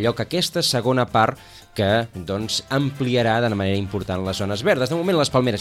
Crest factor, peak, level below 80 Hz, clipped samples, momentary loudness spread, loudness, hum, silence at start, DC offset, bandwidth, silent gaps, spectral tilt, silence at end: 16 dB; -4 dBFS; -50 dBFS; under 0.1%; 7 LU; -21 LUFS; none; 0 s; under 0.1%; 16 kHz; none; -5 dB/octave; 0 s